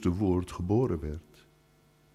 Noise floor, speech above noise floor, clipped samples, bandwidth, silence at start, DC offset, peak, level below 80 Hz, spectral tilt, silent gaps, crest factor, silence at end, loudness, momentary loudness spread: -63 dBFS; 35 dB; under 0.1%; 13 kHz; 0 s; under 0.1%; -14 dBFS; -48 dBFS; -8.5 dB/octave; none; 16 dB; 0.95 s; -30 LUFS; 12 LU